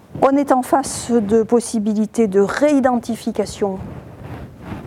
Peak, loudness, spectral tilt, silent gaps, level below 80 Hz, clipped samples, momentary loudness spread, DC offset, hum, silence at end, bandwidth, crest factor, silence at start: 0 dBFS; -17 LUFS; -5.5 dB/octave; none; -48 dBFS; under 0.1%; 19 LU; under 0.1%; none; 0 s; 15.5 kHz; 18 dB; 0.1 s